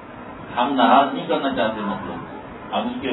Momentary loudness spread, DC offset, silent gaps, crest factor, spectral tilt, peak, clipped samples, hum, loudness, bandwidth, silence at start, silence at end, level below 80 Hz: 20 LU; under 0.1%; none; 20 dB; -8.5 dB/octave; -2 dBFS; under 0.1%; none; -21 LUFS; 4.1 kHz; 0 s; 0 s; -54 dBFS